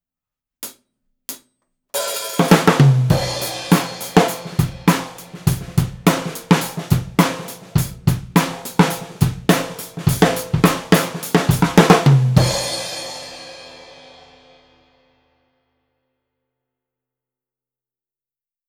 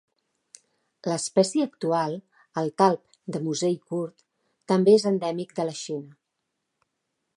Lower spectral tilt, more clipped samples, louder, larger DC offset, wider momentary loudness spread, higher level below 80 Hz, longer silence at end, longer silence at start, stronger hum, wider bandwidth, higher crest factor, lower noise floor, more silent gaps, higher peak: about the same, -5.5 dB/octave vs -5.5 dB/octave; neither; first, -17 LUFS vs -25 LUFS; neither; first, 20 LU vs 15 LU; first, -40 dBFS vs -78 dBFS; first, 4.9 s vs 1.3 s; second, 0.6 s vs 1.05 s; neither; first, over 20 kHz vs 11.5 kHz; about the same, 18 dB vs 22 dB; first, under -90 dBFS vs -80 dBFS; neither; first, 0 dBFS vs -4 dBFS